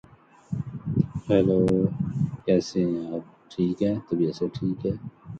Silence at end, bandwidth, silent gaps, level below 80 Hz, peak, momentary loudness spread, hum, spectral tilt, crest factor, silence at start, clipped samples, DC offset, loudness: 0 s; 8 kHz; none; -50 dBFS; -8 dBFS; 13 LU; none; -8.5 dB/octave; 18 dB; 0.5 s; under 0.1%; under 0.1%; -26 LUFS